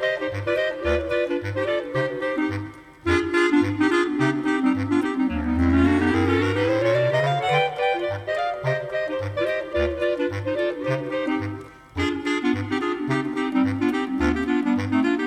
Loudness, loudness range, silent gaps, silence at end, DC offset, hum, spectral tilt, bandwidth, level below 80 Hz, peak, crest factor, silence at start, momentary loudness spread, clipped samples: -23 LUFS; 4 LU; none; 0 s; under 0.1%; 50 Hz at -55 dBFS; -6.5 dB/octave; 10.5 kHz; -42 dBFS; -8 dBFS; 16 dB; 0 s; 6 LU; under 0.1%